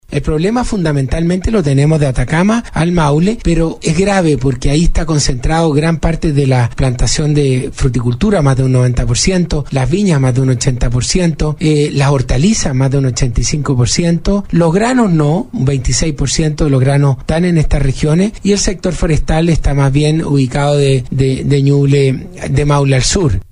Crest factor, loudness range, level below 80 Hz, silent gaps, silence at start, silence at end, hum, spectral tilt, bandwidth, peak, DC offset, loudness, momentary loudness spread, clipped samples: 10 dB; 1 LU; -22 dBFS; none; 0.1 s; 0.1 s; none; -6 dB/octave; 11 kHz; 0 dBFS; under 0.1%; -13 LUFS; 4 LU; under 0.1%